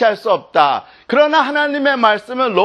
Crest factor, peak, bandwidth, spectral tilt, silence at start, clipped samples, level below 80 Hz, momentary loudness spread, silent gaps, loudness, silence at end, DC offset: 14 dB; 0 dBFS; 10.5 kHz; -4.5 dB/octave; 0 s; under 0.1%; -64 dBFS; 5 LU; none; -15 LUFS; 0 s; under 0.1%